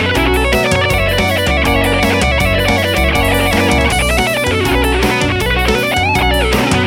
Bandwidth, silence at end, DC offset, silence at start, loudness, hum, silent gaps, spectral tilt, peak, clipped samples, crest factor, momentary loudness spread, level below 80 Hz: 17 kHz; 0 s; under 0.1%; 0 s; -12 LUFS; none; none; -4.5 dB/octave; 0 dBFS; under 0.1%; 12 dB; 1 LU; -20 dBFS